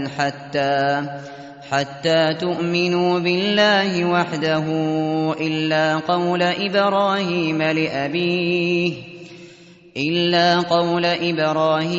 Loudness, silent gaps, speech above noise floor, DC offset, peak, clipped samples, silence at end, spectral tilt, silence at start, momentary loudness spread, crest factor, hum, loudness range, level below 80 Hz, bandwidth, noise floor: -19 LUFS; none; 26 dB; under 0.1%; -4 dBFS; under 0.1%; 0 s; -3.5 dB/octave; 0 s; 8 LU; 16 dB; none; 2 LU; -62 dBFS; 8 kHz; -45 dBFS